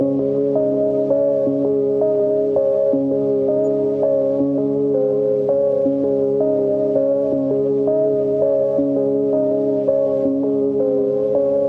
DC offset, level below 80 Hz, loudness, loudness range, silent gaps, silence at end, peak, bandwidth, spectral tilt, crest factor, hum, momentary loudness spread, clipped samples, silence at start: under 0.1%; -62 dBFS; -18 LUFS; 0 LU; none; 0 s; -6 dBFS; 3 kHz; -11 dB/octave; 12 dB; none; 1 LU; under 0.1%; 0 s